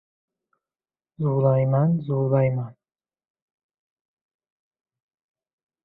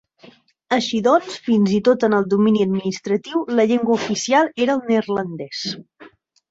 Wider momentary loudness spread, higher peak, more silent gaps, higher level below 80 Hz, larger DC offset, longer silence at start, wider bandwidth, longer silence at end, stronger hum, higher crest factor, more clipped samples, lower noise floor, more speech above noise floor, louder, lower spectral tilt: about the same, 9 LU vs 9 LU; second, -10 dBFS vs -2 dBFS; neither; about the same, -62 dBFS vs -62 dBFS; neither; first, 1.2 s vs 0.7 s; second, 3.9 kHz vs 8 kHz; first, 3.15 s vs 0.45 s; neither; about the same, 18 dB vs 16 dB; neither; first, under -90 dBFS vs -49 dBFS; first, over 69 dB vs 31 dB; second, -22 LUFS vs -19 LUFS; first, -14 dB/octave vs -5.5 dB/octave